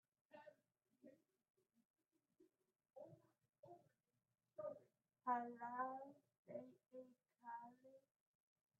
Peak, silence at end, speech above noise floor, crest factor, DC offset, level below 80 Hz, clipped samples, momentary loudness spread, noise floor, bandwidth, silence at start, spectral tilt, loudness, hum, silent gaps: -30 dBFS; 0.8 s; 36 dB; 26 dB; under 0.1%; under -90 dBFS; under 0.1%; 21 LU; -86 dBFS; 3.6 kHz; 0.3 s; 0 dB/octave; -52 LUFS; none; 1.50-1.54 s, 1.85-1.94 s, 3.59-3.63 s, 6.39-6.45 s